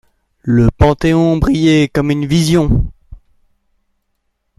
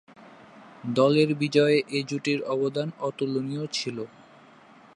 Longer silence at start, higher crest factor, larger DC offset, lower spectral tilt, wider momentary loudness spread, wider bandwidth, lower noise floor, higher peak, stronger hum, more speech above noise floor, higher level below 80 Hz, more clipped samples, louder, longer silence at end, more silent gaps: first, 0.45 s vs 0.25 s; about the same, 14 dB vs 18 dB; neither; about the same, -6.5 dB/octave vs -5.5 dB/octave; second, 5 LU vs 12 LU; first, 13 kHz vs 11.5 kHz; first, -67 dBFS vs -53 dBFS; first, 0 dBFS vs -8 dBFS; neither; first, 56 dB vs 28 dB; first, -26 dBFS vs -76 dBFS; neither; first, -13 LUFS vs -25 LUFS; first, 1.45 s vs 0.9 s; neither